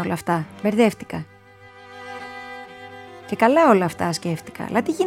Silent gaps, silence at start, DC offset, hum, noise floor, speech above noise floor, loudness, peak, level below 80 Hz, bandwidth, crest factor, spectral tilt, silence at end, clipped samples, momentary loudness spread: none; 0 s; under 0.1%; none; -47 dBFS; 27 dB; -20 LUFS; -2 dBFS; -60 dBFS; 16 kHz; 20 dB; -6 dB/octave; 0 s; under 0.1%; 23 LU